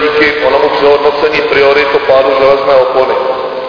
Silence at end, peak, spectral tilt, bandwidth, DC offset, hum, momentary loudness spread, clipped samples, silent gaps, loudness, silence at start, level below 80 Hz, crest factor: 0 s; 0 dBFS; -5 dB/octave; 5.4 kHz; 0.2%; none; 4 LU; 0.9%; none; -8 LUFS; 0 s; -40 dBFS; 8 dB